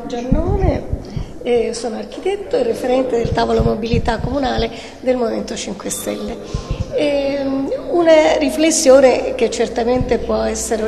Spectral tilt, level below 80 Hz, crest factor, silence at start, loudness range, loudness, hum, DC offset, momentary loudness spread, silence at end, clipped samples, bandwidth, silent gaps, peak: -5 dB/octave; -30 dBFS; 16 dB; 0 s; 7 LU; -17 LUFS; none; 0.4%; 13 LU; 0 s; under 0.1%; 13 kHz; none; 0 dBFS